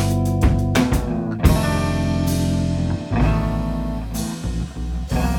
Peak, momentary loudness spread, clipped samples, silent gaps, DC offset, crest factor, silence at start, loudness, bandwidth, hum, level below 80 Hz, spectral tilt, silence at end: 0 dBFS; 8 LU; under 0.1%; none; under 0.1%; 18 dB; 0 s; -21 LUFS; 19 kHz; none; -26 dBFS; -6.5 dB/octave; 0 s